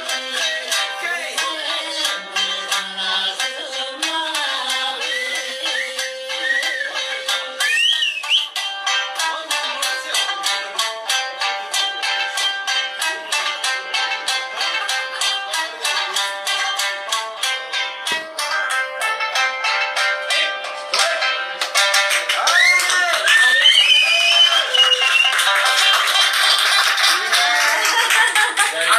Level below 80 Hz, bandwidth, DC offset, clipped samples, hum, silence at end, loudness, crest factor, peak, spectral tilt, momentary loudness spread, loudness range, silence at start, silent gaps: under -90 dBFS; 15.5 kHz; under 0.1%; under 0.1%; none; 0 s; -16 LUFS; 18 dB; -2 dBFS; 3 dB/octave; 10 LU; 9 LU; 0 s; none